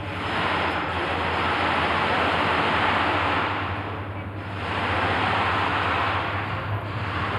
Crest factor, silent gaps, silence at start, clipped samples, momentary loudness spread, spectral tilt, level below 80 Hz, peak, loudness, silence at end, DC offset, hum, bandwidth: 16 dB; none; 0 s; under 0.1%; 8 LU; -5.5 dB/octave; -48 dBFS; -10 dBFS; -24 LUFS; 0 s; under 0.1%; none; 12 kHz